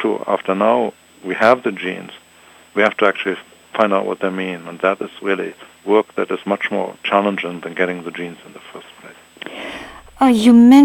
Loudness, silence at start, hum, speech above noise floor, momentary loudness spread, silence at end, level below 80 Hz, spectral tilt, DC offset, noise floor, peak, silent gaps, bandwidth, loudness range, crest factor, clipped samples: -17 LUFS; 0 s; none; 31 dB; 18 LU; 0 s; -56 dBFS; -5.5 dB/octave; under 0.1%; -47 dBFS; 0 dBFS; none; 14 kHz; 4 LU; 18 dB; under 0.1%